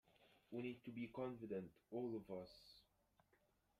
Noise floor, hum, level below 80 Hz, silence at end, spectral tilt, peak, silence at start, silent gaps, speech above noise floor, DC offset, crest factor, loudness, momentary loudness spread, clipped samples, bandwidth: -81 dBFS; none; -82 dBFS; 1 s; -8 dB/octave; -36 dBFS; 0.2 s; none; 31 dB; under 0.1%; 18 dB; -51 LUFS; 14 LU; under 0.1%; 15 kHz